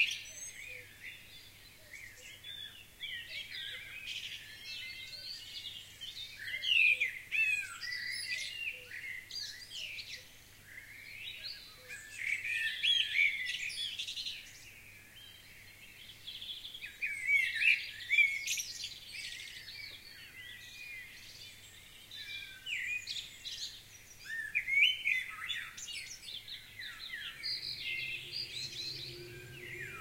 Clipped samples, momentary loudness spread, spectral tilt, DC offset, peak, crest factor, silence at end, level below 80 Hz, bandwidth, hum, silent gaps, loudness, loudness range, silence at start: under 0.1%; 22 LU; 0.5 dB/octave; under 0.1%; -16 dBFS; 24 dB; 0 s; -68 dBFS; 16 kHz; none; none; -35 LUFS; 12 LU; 0 s